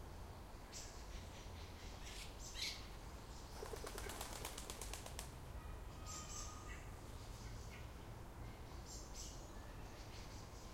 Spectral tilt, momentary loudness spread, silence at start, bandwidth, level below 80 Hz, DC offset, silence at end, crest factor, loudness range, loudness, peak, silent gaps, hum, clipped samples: -3 dB/octave; 7 LU; 0 s; 16.5 kHz; -56 dBFS; under 0.1%; 0 s; 22 dB; 4 LU; -52 LUFS; -28 dBFS; none; none; under 0.1%